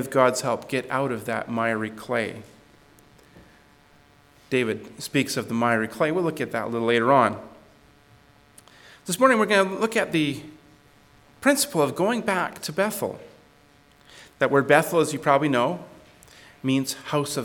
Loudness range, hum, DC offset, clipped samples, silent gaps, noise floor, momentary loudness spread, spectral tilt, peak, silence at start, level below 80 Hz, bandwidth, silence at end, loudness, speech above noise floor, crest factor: 7 LU; none; under 0.1%; under 0.1%; none; -56 dBFS; 11 LU; -4.5 dB/octave; -2 dBFS; 0 s; -64 dBFS; 19 kHz; 0 s; -23 LUFS; 33 dB; 22 dB